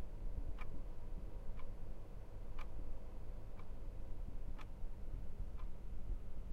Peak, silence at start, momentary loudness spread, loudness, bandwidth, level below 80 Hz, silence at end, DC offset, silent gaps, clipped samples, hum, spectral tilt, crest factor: -30 dBFS; 0 s; 4 LU; -53 LUFS; 3.6 kHz; -46 dBFS; 0 s; under 0.1%; none; under 0.1%; none; -7.5 dB/octave; 10 dB